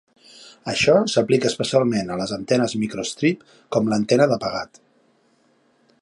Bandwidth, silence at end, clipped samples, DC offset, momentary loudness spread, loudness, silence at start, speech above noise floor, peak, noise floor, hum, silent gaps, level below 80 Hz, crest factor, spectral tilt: 11.5 kHz; 1.35 s; under 0.1%; under 0.1%; 10 LU; -21 LUFS; 0.4 s; 41 dB; -4 dBFS; -61 dBFS; none; none; -58 dBFS; 18 dB; -5 dB/octave